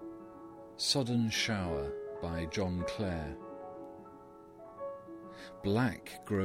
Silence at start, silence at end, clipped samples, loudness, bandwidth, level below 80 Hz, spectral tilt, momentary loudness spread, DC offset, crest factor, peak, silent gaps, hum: 0 s; 0 s; under 0.1%; -35 LUFS; 16.5 kHz; -56 dBFS; -4.5 dB/octave; 20 LU; under 0.1%; 20 dB; -16 dBFS; none; none